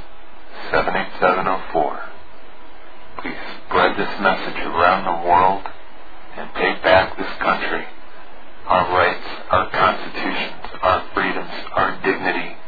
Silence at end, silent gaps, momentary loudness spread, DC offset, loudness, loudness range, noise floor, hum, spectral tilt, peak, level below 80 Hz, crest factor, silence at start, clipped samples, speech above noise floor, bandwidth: 0 s; none; 16 LU; 5%; -19 LUFS; 4 LU; -43 dBFS; none; -7 dB/octave; -2 dBFS; -44 dBFS; 20 dB; 0 s; under 0.1%; 25 dB; 5 kHz